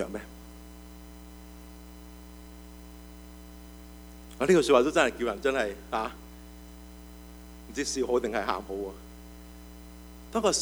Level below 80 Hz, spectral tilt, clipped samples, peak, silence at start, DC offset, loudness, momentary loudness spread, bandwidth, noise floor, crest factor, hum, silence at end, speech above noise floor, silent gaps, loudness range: -50 dBFS; -4 dB/octave; under 0.1%; -8 dBFS; 0 s; under 0.1%; -28 LUFS; 24 LU; over 20 kHz; -47 dBFS; 24 dB; none; 0 s; 20 dB; none; 20 LU